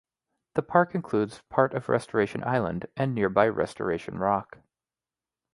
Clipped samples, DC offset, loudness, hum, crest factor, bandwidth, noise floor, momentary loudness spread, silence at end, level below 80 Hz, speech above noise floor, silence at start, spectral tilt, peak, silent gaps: under 0.1%; under 0.1%; -27 LUFS; none; 22 dB; 11.5 kHz; under -90 dBFS; 7 LU; 1.1 s; -58 dBFS; over 64 dB; 0.55 s; -7.5 dB/octave; -4 dBFS; none